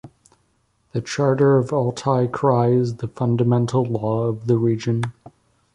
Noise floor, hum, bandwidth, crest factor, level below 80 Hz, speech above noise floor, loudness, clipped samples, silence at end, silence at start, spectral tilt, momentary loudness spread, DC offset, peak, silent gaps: -65 dBFS; none; 10 kHz; 16 dB; -56 dBFS; 46 dB; -20 LUFS; under 0.1%; 0.65 s; 0.05 s; -7.5 dB/octave; 9 LU; under 0.1%; -4 dBFS; none